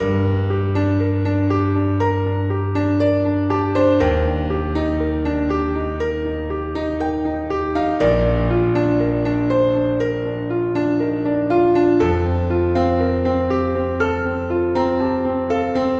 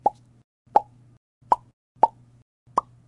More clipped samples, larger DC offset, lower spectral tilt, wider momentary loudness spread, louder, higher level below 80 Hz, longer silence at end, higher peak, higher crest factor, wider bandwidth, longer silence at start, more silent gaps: neither; neither; first, -9 dB/octave vs -6 dB/octave; about the same, 6 LU vs 5 LU; first, -19 LUFS vs -25 LUFS; first, -32 dBFS vs -64 dBFS; second, 0 s vs 0.3 s; about the same, -4 dBFS vs -2 dBFS; second, 14 dB vs 24 dB; second, 7.2 kHz vs 11.5 kHz; about the same, 0 s vs 0.05 s; second, none vs 0.44-0.65 s, 1.17-1.41 s, 1.73-1.95 s, 2.42-2.66 s